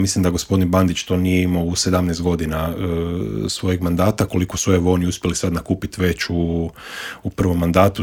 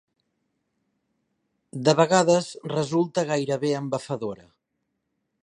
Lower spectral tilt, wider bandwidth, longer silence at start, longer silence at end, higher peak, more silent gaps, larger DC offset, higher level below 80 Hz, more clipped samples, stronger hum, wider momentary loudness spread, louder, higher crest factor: about the same, -5.5 dB/octave vs -5 dB/octave; first, 17.5 kHz vs 11 kHz; second, 0 s vs 1.75 s; second, 0 s vs 1.1 s; first, 0 dBFS vs -4 dBFS; neither; neither; first, -40 dBFS vs -68 dBFS; neither; neither; second, 7 LU vs 13 LU; first, -19 LUFS vs -24 LUFS; about the same, 18 dB vs 22 dB